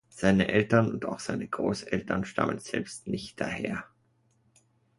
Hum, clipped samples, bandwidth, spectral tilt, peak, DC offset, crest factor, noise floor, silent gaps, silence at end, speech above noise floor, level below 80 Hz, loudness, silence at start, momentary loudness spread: none; under 0.1%; 11.5 kHz; -6 dB/octave; -8 dBFS; under 0.1%; 22 dB; -69 dBFS; none; 1.15 s; 40 dB; -56 dBFS; -29 LUFS; 0.15 s; 11 LU